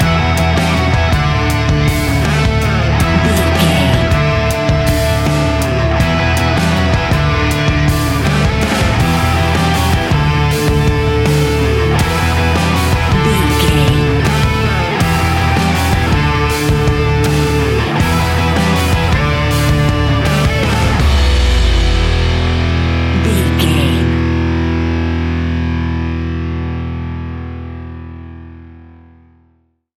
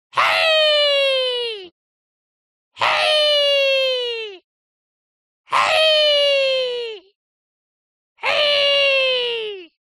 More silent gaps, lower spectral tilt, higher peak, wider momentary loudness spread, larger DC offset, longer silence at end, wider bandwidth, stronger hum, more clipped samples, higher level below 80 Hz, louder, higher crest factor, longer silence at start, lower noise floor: second, none vs 1.72-2.71 s, 4.44-5.44 s, 7.15-8.16 s; first, -5.5 dB/octave vs 0 dB/octave; about the same, 0 dBFS vs -2 dBFS; second, 5 LU vs 13 LU; neither; first, 1.1 s vs 0.2 s; first, 17 kHz vs 13 kHz; neither; neither; first, -20 dBFS vs -72 dBFS; first, -13 LUFS vs -16 LUFS; second, 12 dB vs 18 dB; second, 0 s vs 0.15 s; second, -56 dBFS vs under -90 dBFS